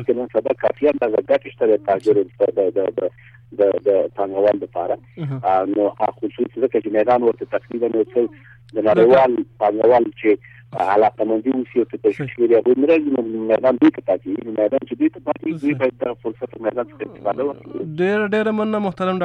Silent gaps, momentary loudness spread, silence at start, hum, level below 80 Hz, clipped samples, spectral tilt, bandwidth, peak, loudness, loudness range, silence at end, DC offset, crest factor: none; 10 LU; 0 s; none; -58 dBFS; under 0.1%; -8.5 dB/octave; 6.2 kHz; -2 dBFS; -19 LUFS; 5 LU; 0 s; under 0.1%; 16 dB